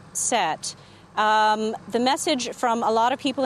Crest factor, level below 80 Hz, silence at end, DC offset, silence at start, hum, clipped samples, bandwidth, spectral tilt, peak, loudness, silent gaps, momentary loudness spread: 16 dB; -66 dBFS; 0 s; under 0.1%; 0.15 s; none; under 0.1%; 13.5 kHz; -2 dB/octave; -8 dBFS; -23 LUFS; none; 8 LU